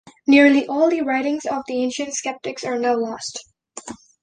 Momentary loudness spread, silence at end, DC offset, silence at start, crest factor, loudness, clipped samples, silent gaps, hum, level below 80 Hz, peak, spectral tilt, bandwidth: 22 LU; 0.25 s; under 0.1%; 0.05 s; 18 dB; -19 LUFS; under 0.1%; none; none; -64 dBFS; -2 dBFS; -3 dB/octave; 9.8 kHz